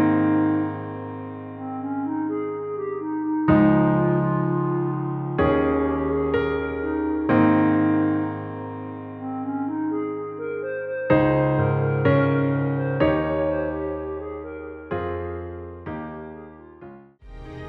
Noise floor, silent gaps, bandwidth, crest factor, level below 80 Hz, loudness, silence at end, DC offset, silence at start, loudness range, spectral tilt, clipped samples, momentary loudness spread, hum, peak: -44 dBFS; none; 4.4 kHz; 16 dB; -44 dBFS; -23 LUFS; 0 s; under 0.1%; 0 s; 7 LU; -11 dB/octave; under 0.1%; 15 LU; none; -6 dBFS